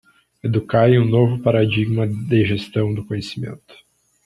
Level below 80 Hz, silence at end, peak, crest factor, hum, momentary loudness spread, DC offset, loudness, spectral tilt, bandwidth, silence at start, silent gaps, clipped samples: -52 dBFS; 0.7 s; -2 dBFS; 16 dB; none; 13 LU; under 0.1%; -19 LUFS; -8.5 dB/octave; 10.5 kHz; 0.45 s; none; under 0.1%